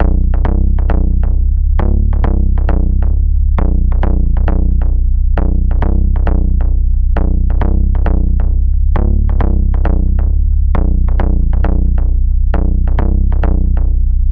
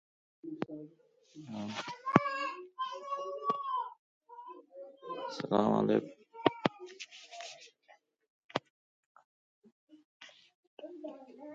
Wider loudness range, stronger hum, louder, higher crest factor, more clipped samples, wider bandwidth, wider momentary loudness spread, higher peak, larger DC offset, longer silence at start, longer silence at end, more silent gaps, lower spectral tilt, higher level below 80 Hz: second, 0 LU vs 14 LU; neither; first, -15 LUFS vs -35 LUFS; second, 8 dB vs 34 dB; neither; second, 3.1 kHz vs 7.8 kHz; second, 1 LU vs 24 LU; about the same, -2 dBFS vs -4 dBFS; neither; second, 0 s vs 0.45 s; about the same, 0 s vs 0 s; second, none vs 3.99-4.21 s, 8.30-8.49 s, 8.70-9.15 s, 9.25-9.62 s, 9.72-9.87 s, 10.05-10.20 s, 10.55-10.77 s; first, -11.5 dB/octave vs -6 dB/octave; first, -10 dBFS vs -76 dBFS